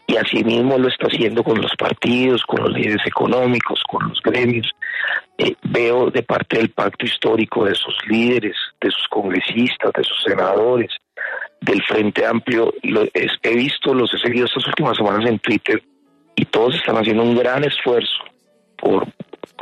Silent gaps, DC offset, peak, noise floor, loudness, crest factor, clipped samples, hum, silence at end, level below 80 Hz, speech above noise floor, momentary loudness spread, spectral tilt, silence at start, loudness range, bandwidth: none; under 0.1%; -2 dBFS; -46 dBFS; -18 LUFS; 16 dB; under 0.1%; none; 0 s; -58 dBFS; 29 dB; 5 LU; -6 dB/octave; 0.1 s; 1 LU; 11 kHz